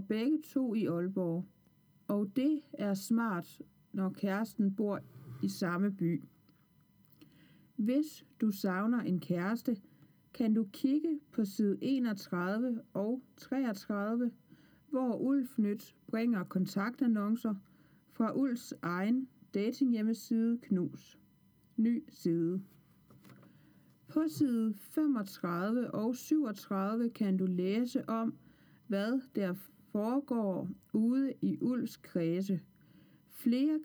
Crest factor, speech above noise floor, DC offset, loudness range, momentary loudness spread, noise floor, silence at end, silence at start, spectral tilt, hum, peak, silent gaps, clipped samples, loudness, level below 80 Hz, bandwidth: 16 dB; 34 dB; under 0.1%; 3 LU; 7 LU; -67 dBFS; 0 s; 0 s; -7 dB/octave; none; -20 dBFS; none; under 0.1%; -34 LUFS; -80 dBFS; over 20 kHz